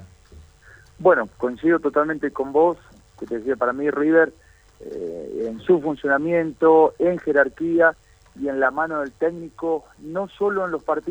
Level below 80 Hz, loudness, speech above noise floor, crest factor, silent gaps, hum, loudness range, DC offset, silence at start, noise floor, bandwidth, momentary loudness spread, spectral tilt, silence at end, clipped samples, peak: -56 dBFS; -21 LUFS; 29 dB; 18 dB; none; none; 4 LU; under 0.1%; 0 s; -49 dBFS; 8.4 kHz; 12 LU; -7.5 dB/octave; 0 s; under 0.1%; -4 dBFS